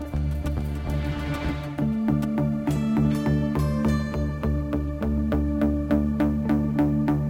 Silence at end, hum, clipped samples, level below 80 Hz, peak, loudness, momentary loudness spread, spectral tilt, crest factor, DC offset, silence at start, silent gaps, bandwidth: 0 s; none; under 0.1%; -32 dBFS; -10 dBFS; -25 LUFS; 6 LU; -8.5 dB/octave; 14 dB; under 0.1%; 0 s; none; 16.5 kHz